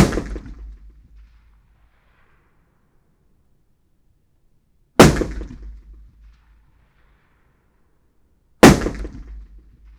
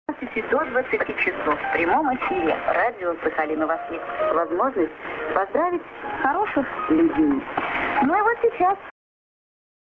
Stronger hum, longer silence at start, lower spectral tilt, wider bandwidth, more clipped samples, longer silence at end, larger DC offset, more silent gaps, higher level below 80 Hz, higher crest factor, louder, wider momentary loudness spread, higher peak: neither; about the same, 0 s vs 0.1 s; second, -5 dB/octave vs -7.5 dB/octave; first, over 20 kHz vs 5.2 kHz; neither; second, 0.6 s vs 1.05 s; neither; neither; first, -34 dBFS vs -54 dBFS; first, 22 dB vs 16 dB; first, -14 LUFS vs -23 LUFS; first, 30 LU vs 7 LU; first, 0 dBFS vs -8 dBFS